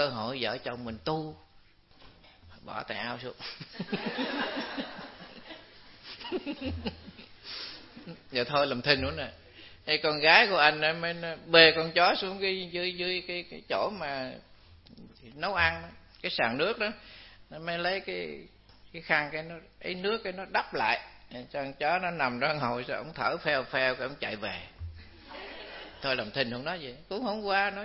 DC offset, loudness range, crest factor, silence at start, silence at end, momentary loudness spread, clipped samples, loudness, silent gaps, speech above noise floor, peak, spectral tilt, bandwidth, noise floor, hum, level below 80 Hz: under 0.1%; 14 LU; 30 dB; 0 s; 0 s; 21 LU; under 0.1%; -29 LUFS; none; 29 dB; -2 dBFS; -7.5 dB/octave; 6 kHz; -59 dBFS; none; -58 dBFS